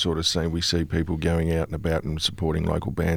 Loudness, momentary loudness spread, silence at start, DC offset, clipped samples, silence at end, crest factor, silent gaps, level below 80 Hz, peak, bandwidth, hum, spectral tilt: -25 LUFS; 3 LU; 0 s; under 0.1%; under 0.1%; 0 s; 16 dB; none; -36 dBFS; -10 dBFS; 16 kHz; none; -5 dB/octave